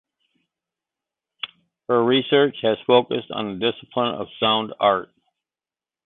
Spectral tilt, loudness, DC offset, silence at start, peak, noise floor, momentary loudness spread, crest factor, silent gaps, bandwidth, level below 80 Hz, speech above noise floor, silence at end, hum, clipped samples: -9.5 dB/octave; -21 LUFS; under 0.1%; 1.45 s; -4 dBFS; under -90 dBFS; 17 LU; 20 dB; none; 4.2 kHz; -64 dBFS; over 70 dB; 1 s; none; under 0.1%